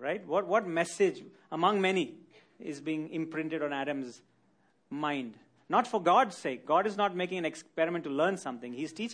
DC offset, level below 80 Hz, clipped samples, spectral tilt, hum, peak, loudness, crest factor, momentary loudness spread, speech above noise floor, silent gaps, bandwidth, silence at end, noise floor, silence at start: under 0.1%; -84 dBFS; under 0.1%; -5 dB/octave; none; -12 dBFS; -31 LUFS; 20 dB; 13 LU; 39 dB; none; 10.5 kHz; 0 s; -70 dBFS; 0 s